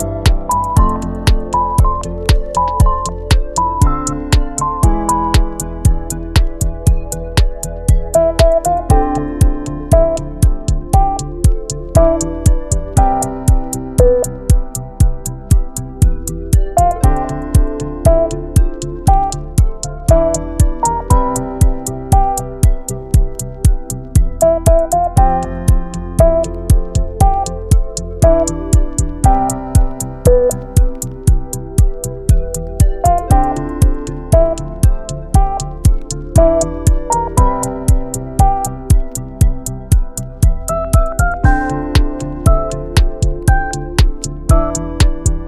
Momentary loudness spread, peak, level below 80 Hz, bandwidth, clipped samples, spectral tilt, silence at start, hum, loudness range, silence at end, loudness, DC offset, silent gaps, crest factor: 7 LU; 0 dBFS; -16 dBFS; 14 kHz; under 0.1%; -6 dB/octave; 0 s; none; 2 LU; 0 s; -15 LUFS; under 0.1%; none; 12 dB